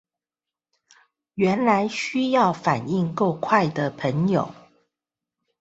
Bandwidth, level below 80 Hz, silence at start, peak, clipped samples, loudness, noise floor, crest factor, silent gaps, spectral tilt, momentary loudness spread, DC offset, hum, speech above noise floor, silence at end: 8 kHz; -62 dBFS; 1.35 s; -4 dBFS; under 0.1%; -22 LUFS; -90 dBFS; 20 dB; none; -6.5 dB/octave; 5 LU; under 0.1%; none; 68 dB; 1.1 s